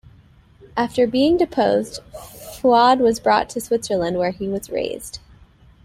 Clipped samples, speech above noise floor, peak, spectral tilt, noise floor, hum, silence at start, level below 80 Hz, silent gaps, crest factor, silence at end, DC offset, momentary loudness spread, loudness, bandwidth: under 0.1%; 31 dB; -2 dBFS; -4.5 dB/octave; -50 dBFS; none; 0.75 s; -50 dBFS; none; 18 dB; 0.65 s; under 0.1%; 20 LU; -19 LUFS; 16.5 kHz